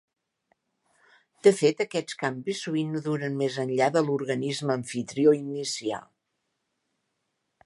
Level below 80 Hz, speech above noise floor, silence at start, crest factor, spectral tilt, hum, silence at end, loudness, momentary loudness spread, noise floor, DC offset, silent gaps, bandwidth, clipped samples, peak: -76 dBFS; 53 dB; 1.45 s; 22 dB; -5 dB/octave; none; 1.6 s; -26 LUFS; 9 LU; -79 dBFS; under 0.1%; none; 11.5 kHz; under 0.1%; -6 dBFS